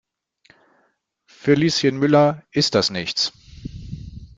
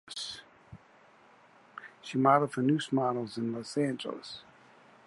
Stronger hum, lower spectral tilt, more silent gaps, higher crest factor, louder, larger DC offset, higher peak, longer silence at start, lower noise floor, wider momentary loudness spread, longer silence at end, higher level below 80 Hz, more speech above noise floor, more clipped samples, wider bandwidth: neither; about the same, -5 dB/octave vs -6 dB/octave; neither; about the same, 20 dB vs 22 dB; first, -19 LUFS vs -30 LUFS; neither; first, -2 dBFS vs -10 dBFS; first, 1.45 s vs 0.05 s; first, -66 dBFS vs -60 dBFS; about the same, 20 LU vs 22 LU; second, 0.1 s vs 0.65 s; first, -48 dBFS vs -74 dBFS; first, 48 dB vs 30 dB; neither; second, 9.4 kHz vs 11.5 kHz